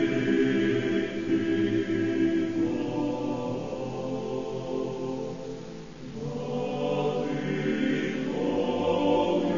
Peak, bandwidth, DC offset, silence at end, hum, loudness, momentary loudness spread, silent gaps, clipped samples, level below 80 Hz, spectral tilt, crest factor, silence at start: -12 dBFS; 7.4 kHz; 0.4%; 0 s; none; -28 LUFS; 10 LU; none; under 0.1%; -56 dBFS; -7 dB/octave; 14 dB; 0 s